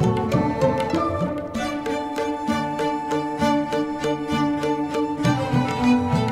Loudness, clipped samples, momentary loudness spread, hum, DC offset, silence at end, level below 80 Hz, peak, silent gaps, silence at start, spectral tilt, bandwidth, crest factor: -23 LUFS; under 0.1%; 6 LU; none; under 0.1%; 0 s; -46 dBFS; -6 dBFS; none; 0 s; -6.5 dB/octave; 15 kHz; 16 dB